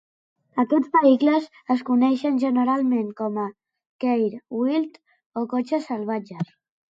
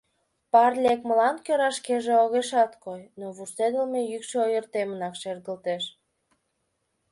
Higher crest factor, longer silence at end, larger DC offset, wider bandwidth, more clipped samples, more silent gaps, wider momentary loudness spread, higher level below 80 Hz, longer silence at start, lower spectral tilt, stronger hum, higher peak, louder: about the same, 16 dB vs 20 dB; second, 0.45 s vs 1.2 s; neither; second, 7.6 kHz vs 11.5 kHz; neither; first, 3.89-3.99 s, 5.26-5.31 s vs none; about the same, 13 LU vs 15 LU; about the same, -76 dBFS vs -74 dBFS; about the same, 0.55 s vs 0.55 s; first, -7.5 dB/octave vs -3.5 dB/octave; neither; about the same, -6 dBFS vs -6 dBFS; about the same, -23 LUFS vs -25 LUFS